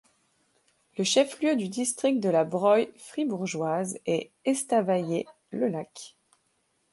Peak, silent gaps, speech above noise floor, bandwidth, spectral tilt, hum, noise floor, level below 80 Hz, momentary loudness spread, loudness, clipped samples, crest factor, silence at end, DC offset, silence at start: -10 dBFS; none; 46 dB; 11.5 kHz; -4.5 dB/octave; none; -72 dBFS; -76 dBFS; 12 LU; -27 LUFS; under 0.1%; 18 dB; 0.85 s; under 0.1%; 0.95 s